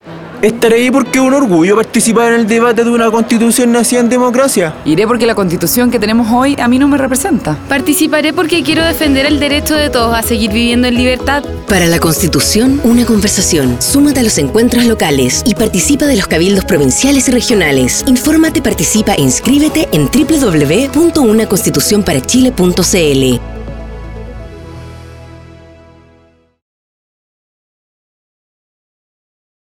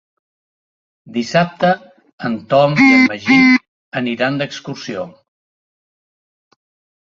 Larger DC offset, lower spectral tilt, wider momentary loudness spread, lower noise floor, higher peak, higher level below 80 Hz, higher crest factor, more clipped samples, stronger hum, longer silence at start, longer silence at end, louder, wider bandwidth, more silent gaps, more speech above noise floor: neither; second, -4 dB/octave vs -6 dB/octave; second, 5 LU vs 17 LU; second, -48 dBFS vs under -90 dBFS; about the same, 0 dBFS vs 0 dBFS; first, -30 dBFS vs -58 dBFS; second, 10 dB vs 18 dB; neither; neither; second, 0.05 s vs 1.05 s; first, 4.25 s vs 1.95 s; first, -10 LUFS vs -14 LUFS; first, 19 kHz vs 7.4 kHz; second, none vs 2.13-2.18 s, 3.68-3.92 s; second, 38 dB vs over 76 dB